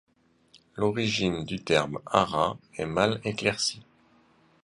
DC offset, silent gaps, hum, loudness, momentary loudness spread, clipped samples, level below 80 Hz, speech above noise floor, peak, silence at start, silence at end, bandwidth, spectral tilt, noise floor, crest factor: under 0.1%; none; none; -27 LUFS; 7 LU; under 0.1%; -56 dBFS; 35 dB; -4 dBFS; 0.75 s; 0.8 s; 11.5 kHz; -4.5 dB/octave; -62 dBFS; 24 dB